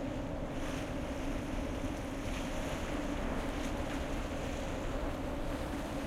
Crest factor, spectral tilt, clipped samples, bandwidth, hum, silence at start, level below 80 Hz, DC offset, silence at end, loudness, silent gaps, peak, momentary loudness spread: 12 dB; -5.5 dB/octave; under 0.1%; 15.5 kHz; none; 0 s; -42 dBFS; under 0.1%; 0 s; -39 LUFS; none; -24 dBFS; 2 LU